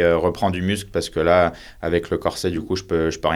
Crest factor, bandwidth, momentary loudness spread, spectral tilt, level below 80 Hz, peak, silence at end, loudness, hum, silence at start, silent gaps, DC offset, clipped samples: 18 dB; 16 kHz; 8 LU; -5.5 dB/octave; -42 dBFS; -2 dBFS; 0 s; -21 LUFS; none; 0 s; none; under 0.1%; under 0.1%